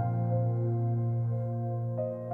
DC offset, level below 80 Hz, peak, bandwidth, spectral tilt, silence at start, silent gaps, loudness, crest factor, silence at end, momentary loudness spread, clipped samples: under 0.1%; -66 dBFS; -20 dBFS; 2.2 kHz; -13 dB/octave; 0 s; none; -31 LUFS; 10 dB; 0 s; 4 LU; under 0.1%